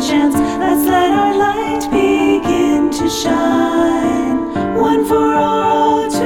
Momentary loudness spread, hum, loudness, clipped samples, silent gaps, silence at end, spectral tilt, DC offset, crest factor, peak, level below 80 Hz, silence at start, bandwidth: 4 LU; none; -14 LUFS; under 0.1%; none; 0 s; -4.5 dB/octave; under 0.1%; 10 dB; -2 dBFS; -40 dBFS; 0 s; 18 kHz